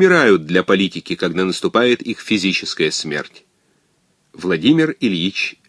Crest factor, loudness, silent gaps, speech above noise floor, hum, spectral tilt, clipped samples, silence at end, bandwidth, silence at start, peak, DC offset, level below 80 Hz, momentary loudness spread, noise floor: 18 dB; -17 LUFS; none; 45 dB; none; -4.5 dB/octave; under 0.1%; 0.15 s; 11 kHz; 0 s; 0 dBFS; under 0.1%; -60 dBFS; 8 LU; -62 dBFS